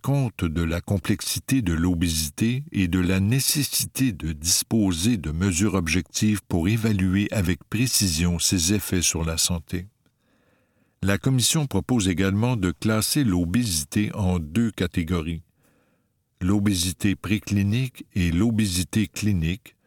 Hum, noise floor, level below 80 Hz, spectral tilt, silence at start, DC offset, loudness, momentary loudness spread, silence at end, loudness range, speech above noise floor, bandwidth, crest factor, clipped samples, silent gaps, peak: none; -69 dBFS; -42 dBFS; -4.5 dB/octave; 0.05 s; under 0.1%; -23 LUFS; 6 LU; 0.2 s; 4 LU; 46 dB; 19 kHz; 18 dB; under 0.1%; none; -4 dBFS